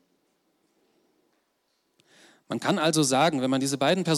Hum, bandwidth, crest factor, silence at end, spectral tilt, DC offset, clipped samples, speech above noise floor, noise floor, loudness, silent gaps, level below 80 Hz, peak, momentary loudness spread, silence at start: none; 15.5 kHz; 16 dB; 0 s; -4 dB/octave; under 0.1%; under 0.1%; 50 dB; -73 dBFS; -24 LUFS; none; -76 dBFS; -12 dBFS; 7 LU; 2.5 s